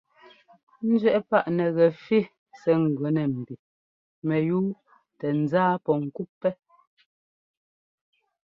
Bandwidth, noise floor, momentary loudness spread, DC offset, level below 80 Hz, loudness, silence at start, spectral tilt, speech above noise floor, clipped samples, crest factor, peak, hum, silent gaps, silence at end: 6.2 kHz; -55 dBFS; 13 LU; under 0.1%; -70 dBFS; -25 LUFS; 0.8 s; -9.5 dB/octave; 31 dB; under 0.1%; 20 dB; -6 dBFS; none; 2.38-2.46 s, 3.59-4.22 s, 6.29-6.41 s; 1.95 s